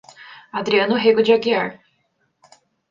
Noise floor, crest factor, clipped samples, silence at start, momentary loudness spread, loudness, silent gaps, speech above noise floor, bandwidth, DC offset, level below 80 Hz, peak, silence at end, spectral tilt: -67 dBFS; 18 dB; under 0.1%; 0.2 s; 12 LU; -18 LUFS; none; 50 dB; 7.4 kHz; under 0.1%; -66 dBFS; -4 dBFS; 1.15 s; -5.5 dB/octave